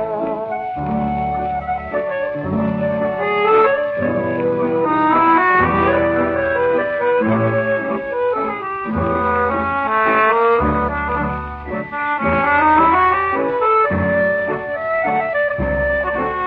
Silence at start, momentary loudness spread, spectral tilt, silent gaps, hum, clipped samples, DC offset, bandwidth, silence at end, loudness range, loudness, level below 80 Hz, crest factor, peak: 0 s; 9 LU; -9.5 dB/octave; none; none; under 0.1%; under 0.1%; 5.2 kHz; 0 s; 3 LU; -17 LUFS; -38 dBFS; 16 dB; -2 dBFS